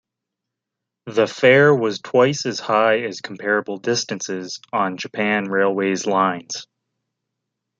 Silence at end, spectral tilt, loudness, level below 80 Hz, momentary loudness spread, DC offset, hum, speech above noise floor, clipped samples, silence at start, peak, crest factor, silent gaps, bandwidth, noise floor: 1.15 s; -4.5 dB/octave; -19 LUFS; -68 dBFS; 13 LU; under 0.1%; none; 64 dB; under 0.1%; 1.05 s; -2 dBFS; 18 dB; none; 7.8 kHz; -83 dBFS